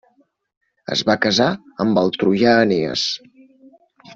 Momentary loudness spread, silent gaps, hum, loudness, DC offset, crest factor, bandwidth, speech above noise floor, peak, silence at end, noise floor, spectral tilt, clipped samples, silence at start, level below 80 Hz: 9 LU; none; none; -18 LUFS; under 0.1%; 18 dB; 7.8 kHz; 43 dB; -2 dBFS; 0 s; -60 dBFS; -4.5 dB/octave; under 0.1%; 0.9 s; -58 dBFS